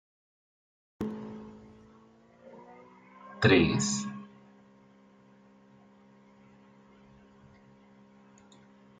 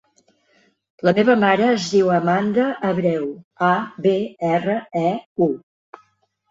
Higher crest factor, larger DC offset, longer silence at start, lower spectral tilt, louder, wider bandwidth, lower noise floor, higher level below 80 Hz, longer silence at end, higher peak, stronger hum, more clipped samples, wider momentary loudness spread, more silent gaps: first, 26 dB vs 18 dB; neither; about the same, 1 s vs 1.05 s; second, -4.5 dB/octave vs -6.5 dB/octave; second, -28 LUFS vs -19 LUFS; first, 9.4 kHz vs 7.8 kHz; second, -59 dBFS vs -63 dBFS; about the same, -64 dBFS vs -62 dBFS; first, 4.75 s vs 0.95 s; second, -10 dBFS vs -2 dBFS; neither; neither; first, 30 LU vs 7 LU; second, none vs 3.44-3.51 s, 5.26-5.36 s